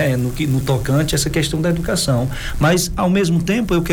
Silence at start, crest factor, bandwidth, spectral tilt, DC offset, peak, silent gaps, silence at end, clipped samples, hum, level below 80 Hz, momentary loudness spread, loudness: 0 s; 14 dB; 18.5 kHz; -5 dB/octave; under 0.1%; -4 dBFS; none; 0 s; under 0.1%; none; -30 dBFS; 3 LU; -18 LUFS